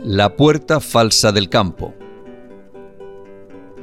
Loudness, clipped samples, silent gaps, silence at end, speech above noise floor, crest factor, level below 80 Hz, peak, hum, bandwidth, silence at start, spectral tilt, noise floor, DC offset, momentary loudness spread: -14 LUFS; under 0.1%; none; 0 s; 25 dB; 16 dB; -44 dBFS; -2 dBFS; none; 16.5 kHz; 0 s; -4.5 dB/octave; -39 dBFS; 0.6%; 13 LU